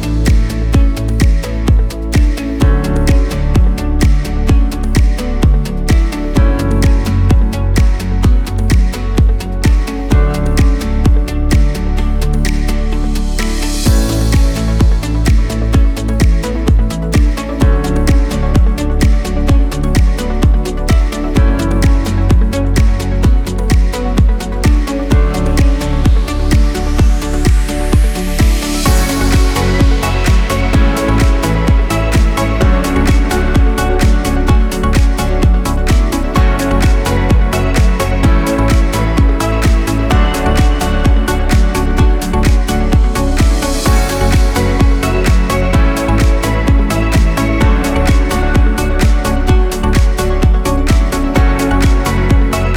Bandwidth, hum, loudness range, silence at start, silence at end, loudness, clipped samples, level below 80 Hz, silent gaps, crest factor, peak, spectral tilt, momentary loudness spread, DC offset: 16 kHz; none; 1 LU; 0 s; 0 s; -13 LUFS; under 0.1%; -12 dBFS; none; 10 dB; 0 dBFS; -6 dB/octave; 2 LU; under 0.1%